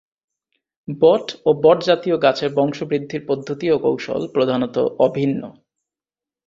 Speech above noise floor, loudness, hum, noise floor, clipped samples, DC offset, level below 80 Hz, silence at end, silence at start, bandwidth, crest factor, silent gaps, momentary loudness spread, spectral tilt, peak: over 72 dB; -19 LUFS; none; under -90 dBFS; under 0.1%; under 0.1%; -60 dBFS; 0.95 s; 0.9 s; 7.4 kHz; 18 dB; none; 9 LU; -6.5 dB/octave; -2 dBFS